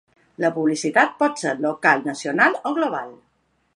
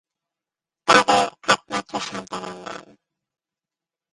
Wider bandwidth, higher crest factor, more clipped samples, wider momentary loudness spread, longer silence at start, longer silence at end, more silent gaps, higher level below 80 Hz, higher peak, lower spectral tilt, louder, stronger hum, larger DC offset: about the same, 11.5 kHz vs 11.5 kHz; about the same, 20 dB vs 24 dB; neither; second, 7 LU vs 20 LU; second, 0.4 s vs 0.85 s; second, 0.6 s vs 1.3 s; neither; second, -74 dBFS vs -64 dBFS; about the same, -2 dBFS vs 0 dBFS; first, -4.5 dB/octave vs -2.5 dB/octave; about the same, -20 LUFS vs -20 LUFS; neither; neither